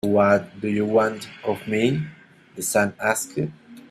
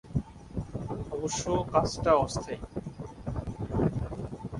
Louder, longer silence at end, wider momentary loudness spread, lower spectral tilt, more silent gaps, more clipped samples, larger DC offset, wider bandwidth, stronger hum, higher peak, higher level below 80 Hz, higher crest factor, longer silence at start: first, -23 LUFS vs -31 LUFS; about the same, 0.1 s vs 0 s; second, 11 LU vs 14 LU; about the same, -5 dB/octave vs -6 dB/octave; neither; neither; neither; first, 15 kHz vs 11.5 kHz; neither; first, -4 dBFS vs -10 dBFS; second, -60 dBFS vs -44 dBFS; about the same, 18 dB vs 20 dB; about the same, 0.05 s vs 0.05 s